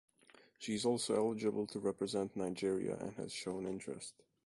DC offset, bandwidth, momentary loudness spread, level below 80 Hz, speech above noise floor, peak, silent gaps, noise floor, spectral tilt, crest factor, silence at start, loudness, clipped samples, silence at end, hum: under 0.1%; 11.5 kHz; 10 LU; -74 dBFS; 28 dB; -22 dBFS; none; -66 dBFS; -4.5 dB/octave; 18 dB; 0.6 s; -39 LUFS; under 0.1%; 0.35 s; none